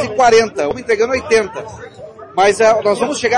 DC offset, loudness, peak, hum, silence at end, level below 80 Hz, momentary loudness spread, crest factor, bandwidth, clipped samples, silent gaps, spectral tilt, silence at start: under 0.1%; -14 LUFS; -2 dBFS; none; 0 s; -50 dBFS; 21 LU; 12 dB; 11.5 kHz; under 0.1%; none; -3.5 dB/octave; 0 s